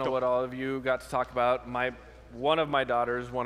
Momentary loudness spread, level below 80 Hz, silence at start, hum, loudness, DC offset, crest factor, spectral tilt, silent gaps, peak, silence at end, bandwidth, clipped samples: 6 LU; -54 dBFS; 0 s; none; -29 LUFS; under 0.1%; 18 dB; -5.5 dB/octave; none; -12 dBFS; 0 s; 14 kHz; under 0.1%